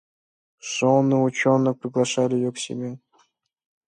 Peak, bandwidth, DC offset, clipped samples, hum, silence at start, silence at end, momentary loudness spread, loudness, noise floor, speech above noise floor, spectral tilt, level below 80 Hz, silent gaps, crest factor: -6 dBFS; 10 kHz; under 0.1%; under 0.1%; none; 0.65 s; 0.9 s; 14 LU; -22 LUFS; -65 dBFS; 44 dB; -5.5 dB/octave; -70 dBFS; none; 18 dB